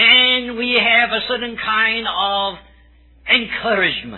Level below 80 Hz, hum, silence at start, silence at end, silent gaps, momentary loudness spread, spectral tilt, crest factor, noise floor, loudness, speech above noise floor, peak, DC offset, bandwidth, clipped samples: -48 dBFS; none; 0 s; 0 s; none; 10 LU; -5 dB/octave; 18 dB; -49 dBFS; -15 LUFS; 29 dB; 0 dBFS; under 0.1%; 4.3 kHz; under 0.1%